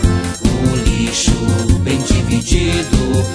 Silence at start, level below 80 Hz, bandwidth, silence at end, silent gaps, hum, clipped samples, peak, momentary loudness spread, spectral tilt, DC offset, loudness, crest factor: 0 s; -20 dBFS; 11 kHz; 0 s; none; none; under 0.1%; 0 dBFS; 1 LU; -5 dB/octave; under 0.1%; -15 LUFS; 14 dB